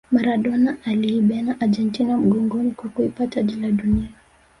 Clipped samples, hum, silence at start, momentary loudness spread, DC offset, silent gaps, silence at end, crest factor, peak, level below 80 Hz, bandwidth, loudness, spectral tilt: under 0.1%; none; 0.1 s; 5 LU; under 0.1%; none; 0.5 s; 16 dB; -6 dBFS; -42 dBFS; 11 kHz; -21 LUFS; -8 dB/octave